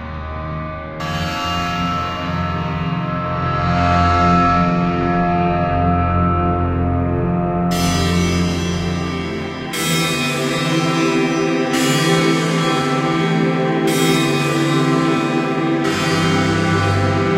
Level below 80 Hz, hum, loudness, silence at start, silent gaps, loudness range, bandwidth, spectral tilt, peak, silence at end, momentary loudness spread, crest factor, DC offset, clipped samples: -34 dBFS; none; -17 LUFS; 0 s; none; 3 LU; 16 kHz; -5.5 dB/octave; -2 dBFS; 0 s; 7 LU; 14 dB; under 0.1%; under 0.1%